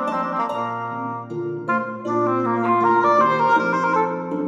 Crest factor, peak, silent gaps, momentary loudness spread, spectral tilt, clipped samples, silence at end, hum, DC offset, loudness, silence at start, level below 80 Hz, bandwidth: 14 dB; -6 dBFS; none; 11 LU; -7 dB/octave; under 0.1%; 0 s; none; under 0.1%; -20 LUFS; 0 s; -78 dBFS; 7.8 kHz